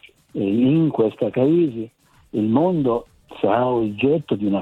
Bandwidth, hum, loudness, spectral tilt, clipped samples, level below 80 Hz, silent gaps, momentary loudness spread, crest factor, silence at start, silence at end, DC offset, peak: 4.2 kHz; none; -20 LUFS; -9.5 dB/octave; under 0.1%; -56 dBFS; none; 9 LU; 16 dB; 0.35 s; 0 s; under 0.1%; -4 dBFS